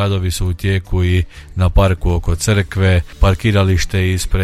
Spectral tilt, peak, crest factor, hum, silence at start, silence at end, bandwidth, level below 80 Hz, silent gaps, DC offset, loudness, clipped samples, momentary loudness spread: -5.5 dB/octave; -2 dBFS; 14 dB; none; 0 s; 0 s; 14 kHz; -22 dBFS; none; under 0.1%; -16 LUFS; under 0.1%; 5 LU